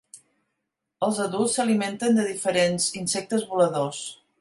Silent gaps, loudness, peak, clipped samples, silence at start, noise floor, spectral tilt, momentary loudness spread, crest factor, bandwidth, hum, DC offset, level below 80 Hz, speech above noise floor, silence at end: none; -24 LUFS; -8 dBFS; under 0.1%; 0.15 s; -81 dBFS; -4 dB/octave; 6 LU; 16 dB; 11.5 kHz; none; under 0.1%; -68 dBFS; 57 dB; 0.25 s